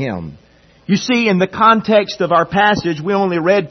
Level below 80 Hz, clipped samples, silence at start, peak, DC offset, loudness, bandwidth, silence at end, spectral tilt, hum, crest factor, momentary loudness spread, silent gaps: -50 dBFS; under 0.1%; 0 s; 0 dBFS; under 0.1%; -14 LUFS; 6.4 kHz; 0 s; -5.5 dB/octave; none; 14 dB; 11 LU; none